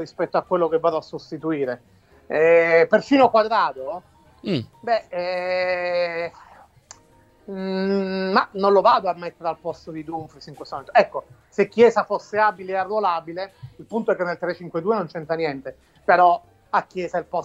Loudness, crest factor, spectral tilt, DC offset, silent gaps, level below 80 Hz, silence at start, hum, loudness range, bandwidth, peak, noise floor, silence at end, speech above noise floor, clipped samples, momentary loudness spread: -21 LUFS; 20 dB; -6 dB/octave; under 0.1%; none; -62 dBFS; 0 s; none; 7 LU; 8 kHz; -2 dBFS; -55 dBFS; 0 s; 34 dB; under 0.1%; 17 LU